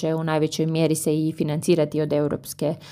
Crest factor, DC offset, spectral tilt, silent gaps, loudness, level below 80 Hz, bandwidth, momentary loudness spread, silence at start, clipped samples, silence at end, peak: 16 dB; under 0.1%; -6 dB/octave; none; -23 LUFS; -60 dBFS; 15.5 kHz; 6 LU; 0 s; under 0.1%; 0 s; -8 dBFS